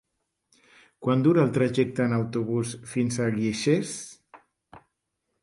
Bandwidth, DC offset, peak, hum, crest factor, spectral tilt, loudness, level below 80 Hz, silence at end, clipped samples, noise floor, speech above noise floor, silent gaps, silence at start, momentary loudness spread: 11.5 kHz; under 0.1%; -10 dBFS; none; 18 dB; -6 dB/octave; -25 LUFS; -62 dBFS; 0.65 s; under 0.1%; -79 dBFS; 55 dB; none; 1 s; 11 LU